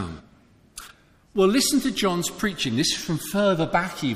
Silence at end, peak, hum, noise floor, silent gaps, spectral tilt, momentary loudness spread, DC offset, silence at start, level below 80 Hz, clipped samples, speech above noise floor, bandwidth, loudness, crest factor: 0 s; -6 dBFS; none; -55 dBFS; none; -4 dB/octave; 21 LU; under 0.1%; 0 s; -50 dBFS; under 0.1%; 33 dB; 15.5 kHz; -23 LUFS; 18 dB